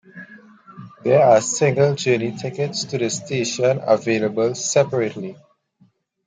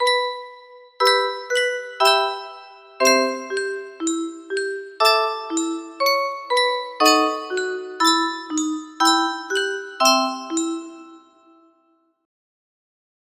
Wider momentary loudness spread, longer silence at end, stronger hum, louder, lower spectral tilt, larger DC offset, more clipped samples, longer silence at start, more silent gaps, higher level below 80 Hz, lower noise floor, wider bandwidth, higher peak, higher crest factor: about the same, 11 LU vs 11 LU; second, 0.9 s vs 2.05 s; neither; about the same, -19 LUFS vs -20 LUFS; first, -4.5 dB/octave vs 0.5 dB/octave; neither; neither; first, 0.15 s vs 0 s; neither; first, -66 dBFS vs -74 dBFS; second, -59 dBFS vs -64 dBFS; second, 9.6 kHz vs 16 kHz; about the same, -2 dBFS vs -2 dBFS; about the same, 18 dB vs 20 dB